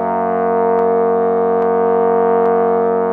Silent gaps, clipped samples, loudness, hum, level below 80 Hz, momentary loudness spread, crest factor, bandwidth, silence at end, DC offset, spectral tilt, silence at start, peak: none; under 0.1%; -14 LUFS; none; -62 dBFS; 2 LU; 10 dB; 3.2 kHz; 0 s; under 0.1%; -10.5 dB/octave; 0 s; -4 dBFS